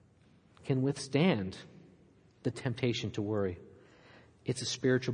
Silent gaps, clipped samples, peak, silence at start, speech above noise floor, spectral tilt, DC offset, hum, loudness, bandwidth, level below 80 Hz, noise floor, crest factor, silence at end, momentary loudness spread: none; under 0.1%; -14 dBFS; 0.65 s; 31 dB; -5.5 dB/octave; under 0.1%; none; -33 LUFS; 10.5 kHz; -70 dBFS; -63 dBFS; 20 dB; 0 s; 16 LU